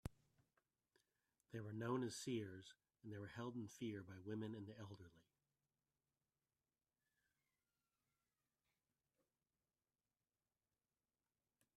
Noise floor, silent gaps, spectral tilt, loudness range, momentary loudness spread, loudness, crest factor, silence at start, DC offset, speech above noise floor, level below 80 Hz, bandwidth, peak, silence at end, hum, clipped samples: under -90 dBFS; none; -5.5 dB/octave; 9 LU; 16 LU; -51 LUFS; 24 dB; 0.05 s; under 0.1%; over 40 dB; -78 dBFS; 13.5 kHz; -32 dBFS; 6.55 s; none; under 0.1%